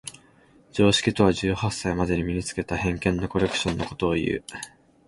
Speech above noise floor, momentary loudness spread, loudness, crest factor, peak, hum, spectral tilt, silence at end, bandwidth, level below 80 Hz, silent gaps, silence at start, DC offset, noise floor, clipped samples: 32 dB; 13 LU; -24 LUFS; 20 dB; -4 dBFS; none; -5 dB/octave; 0.4 s; 11.5 kHz; -42 dBFS; none; 0.05 s; under 0.1%; -56 dBFS; under 0.1%